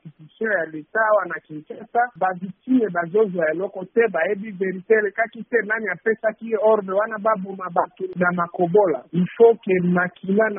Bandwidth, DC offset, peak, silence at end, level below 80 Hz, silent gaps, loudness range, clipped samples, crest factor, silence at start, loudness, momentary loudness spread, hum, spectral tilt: 3.7 kHz; under 0.1%; -2 dBFS; 0 s; -68 dBFS; none; 2 LU; under 0.1%; 18 dB; 0.05 s; -21 LUFS; 8 LU; none; -2 dB/octave